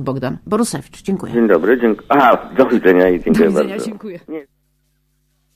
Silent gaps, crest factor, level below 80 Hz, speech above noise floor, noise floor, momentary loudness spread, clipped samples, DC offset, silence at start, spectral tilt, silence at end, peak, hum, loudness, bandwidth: none; 16 dB; -46 dBFS; 48 dB; -63 dBFS; 17 LU; under 0.1%; under 0.1%; 0 s; -6 dB/octave; 1.15 s; 0 dBFS; none; -15 LUFS; 15.5 kHz